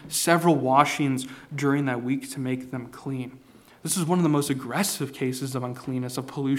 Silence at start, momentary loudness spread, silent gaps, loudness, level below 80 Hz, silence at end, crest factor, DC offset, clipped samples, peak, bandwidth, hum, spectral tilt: 0 s; 14 LU; none; -25 LUFS; -66 dBFS; 0 s; 22 dB; under 0.1%; under 0.1%; -2 dBFS; 17.5 kHz; none; -5 dB/octave